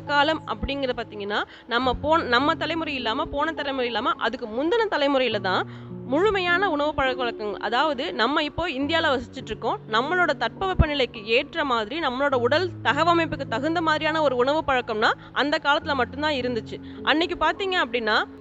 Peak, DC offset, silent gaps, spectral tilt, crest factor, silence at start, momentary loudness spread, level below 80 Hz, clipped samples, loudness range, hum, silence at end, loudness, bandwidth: -4 dBFS; under 0.1%; none; -5.5 dB/octave; 20 dB; 0 s; 7 LU; -42 dBFS; under 0.1%; 2 LU; none; 0 s; -23 LUFS; 8.2 kHz